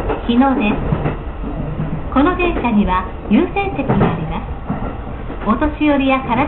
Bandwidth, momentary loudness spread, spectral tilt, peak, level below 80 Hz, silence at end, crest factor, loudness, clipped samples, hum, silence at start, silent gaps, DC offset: 4.2 kHz; 11 LU; -12.5 dB/octave; -4 dBFS; -28 dBFS; 0 s; 12 dB; -17 LUFS; under 0.1%; none; 0 s; none; under 0.1%